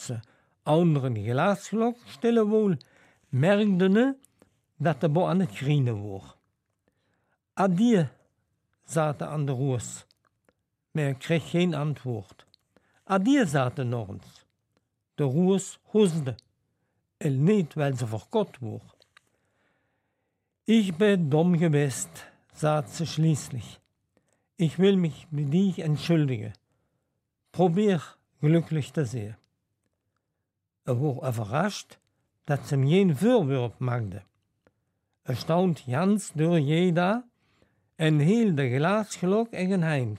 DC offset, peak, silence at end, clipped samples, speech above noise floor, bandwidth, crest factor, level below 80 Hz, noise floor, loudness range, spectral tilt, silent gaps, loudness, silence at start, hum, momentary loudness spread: under 0.1%; -10 dBFS; 0 s; under 0.1%; 58 dB; 14 kHz; 16 dB; -70 dBFS; -82 dBFS; 5 LU; -7 dB/octave; none; -26 LUFS; 0 s; none; 14 LU